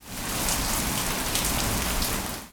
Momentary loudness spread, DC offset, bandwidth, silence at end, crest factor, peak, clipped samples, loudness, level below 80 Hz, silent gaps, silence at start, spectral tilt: 3 LU; under 0.1%; over 20 kHz; 0 s; 22 dB; -6 dBFS; under 0.1%; -26 LUFS; -36 dBFS; none; 0 s; -2.5 dB/octave